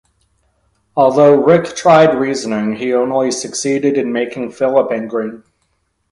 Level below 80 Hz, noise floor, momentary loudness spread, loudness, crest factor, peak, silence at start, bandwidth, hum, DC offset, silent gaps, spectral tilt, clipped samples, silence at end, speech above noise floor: -56 dBFS; -65 dBFS; 11 LU; -14 LUFS; 14 dB; 0 dBFS; 0.95 s; 11.5 kHz; none; under 0.1%; none; -5 dB/octave; under 0.1%; 0.75 s; 51 dB